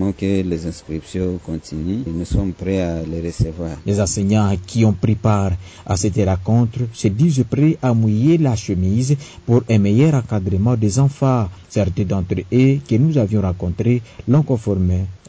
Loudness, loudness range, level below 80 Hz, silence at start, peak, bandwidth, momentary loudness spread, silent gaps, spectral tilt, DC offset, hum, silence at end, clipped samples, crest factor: -18 LUFS; 5 LU; -32 dBFS; 0 s; -6 dBFS; 8 kHz; 8 LU; none; -7.5 dB/octave; under 0.1%; none; 0.1 s; under 0.1%; 12 dB